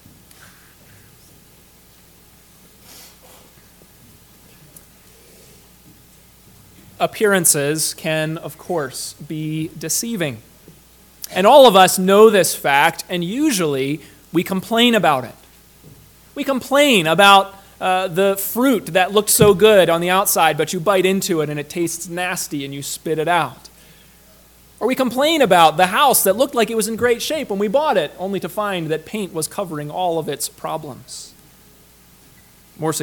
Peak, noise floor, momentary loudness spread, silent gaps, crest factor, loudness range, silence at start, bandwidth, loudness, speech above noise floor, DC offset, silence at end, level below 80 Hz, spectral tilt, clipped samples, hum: 0 dBFS; -49 dBFS; 15 LU; none; 18 dB; 10 LU; 2.95 s; 19 kHz; -16 LUFS; 32 dB; under 0.1%; 0 s; -54 dBFS; -3.5 dB/octave; under 0.1%; none